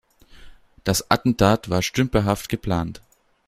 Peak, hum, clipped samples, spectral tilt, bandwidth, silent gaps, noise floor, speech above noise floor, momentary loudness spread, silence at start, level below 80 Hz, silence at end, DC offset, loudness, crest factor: -2 dBFS; none; under 0.1%; -5 dB/octave; 16 kHz; none; -45 dBFS; 24 dB; 8 LU; 0.4 s; -42 dBFS; 0.5 s; under 0.1%; -22 LUFS; 22 dB